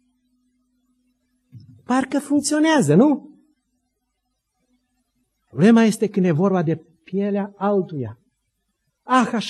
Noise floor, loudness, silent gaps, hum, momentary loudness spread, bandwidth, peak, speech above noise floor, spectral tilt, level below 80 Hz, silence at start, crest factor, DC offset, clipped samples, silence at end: -75 dBFS; -19 LUFS; none; none; 14 LU; 12.5 kHz; -4 dBFS; 57 dB; -6 dB/octave; -70 dBFS; 1.55 s; 18 dB; under 0.1%; under 0.1%; 0 s